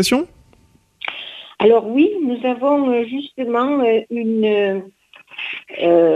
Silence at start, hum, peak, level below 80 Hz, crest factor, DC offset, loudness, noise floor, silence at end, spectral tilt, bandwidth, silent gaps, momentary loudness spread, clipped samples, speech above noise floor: 0 s; none; -2 dBFS; -58 dBFS; 16 dB; under 0.1%; -18 LUFS; -54 dBFS; 0 s; -5 dB/octave; 13.5 kHz; none; 14 LU; under 0.1%; 38 dB